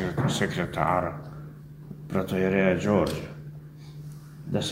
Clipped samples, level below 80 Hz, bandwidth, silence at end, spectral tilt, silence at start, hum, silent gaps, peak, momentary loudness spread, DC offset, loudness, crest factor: under 0.1%; -50 dBFS; 16 kHz; 0 s; -6 dB/octave; 0 s; none; none; -8 dBFS; 20 LU; under 0.1%; -26 LUFS; 20 dB